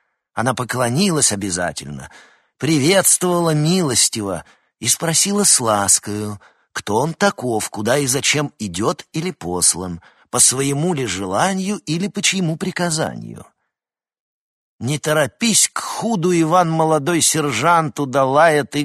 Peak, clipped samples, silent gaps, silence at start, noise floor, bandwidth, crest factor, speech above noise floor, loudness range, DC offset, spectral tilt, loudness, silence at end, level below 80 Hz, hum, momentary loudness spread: 0 dBFS; under 0.1%; 14.20-14.79 s; 0.35 s; -89 dBFS; 13 kHz; 18 dB; 71 dB; 5 LU; under 0.1%; -3 dB/octave; -17 LUFS; 0 s; -54 dBFS; none; 12 LU